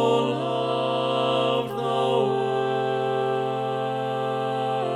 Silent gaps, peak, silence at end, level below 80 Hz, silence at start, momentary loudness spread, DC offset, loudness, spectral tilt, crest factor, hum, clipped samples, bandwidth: none; -8 dBFS; 0 s; -68 dBFS; 0 s; 4 LU; under 0.1%; -24 LUFS; -6 dB/octave; 16 dB; none; under 0.1%; 14 kHz